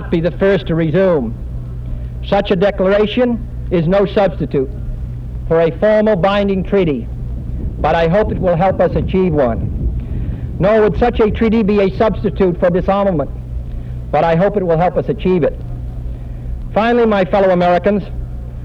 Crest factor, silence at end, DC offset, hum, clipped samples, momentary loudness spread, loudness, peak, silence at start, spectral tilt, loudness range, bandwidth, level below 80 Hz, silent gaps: 14 dB; 0 s; under 0.1%; none; under 0.1%; 14 LU; -15 LUFS; -2 dBFS; 0 s; -9 dB/octave; 2 LU; 7 kHz; -26 dBFS; none